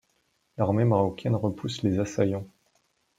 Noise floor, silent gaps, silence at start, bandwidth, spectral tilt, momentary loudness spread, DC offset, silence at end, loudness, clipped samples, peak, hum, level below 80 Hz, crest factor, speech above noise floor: -71 dBFS; none; 0.6 s; 9.2 kHz; -7.5 dB/octave; 11 LU; under 0.1%; 0.7 s; -27 LUFS; under 0.1%; -10 dBFS; none; -60 dBFS; 18 dB; 46 dB